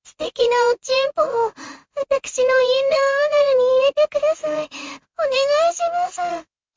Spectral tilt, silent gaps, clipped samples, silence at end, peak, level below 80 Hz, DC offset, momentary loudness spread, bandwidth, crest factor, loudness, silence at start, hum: -1 dB/octave; none; under 0.1%; 0.35 s; -6 dBFS; -60 dBFS; under 0.1%; 13 LU; 7.6 kHz; 14 dB; -19 LUFS; 0.2 s; none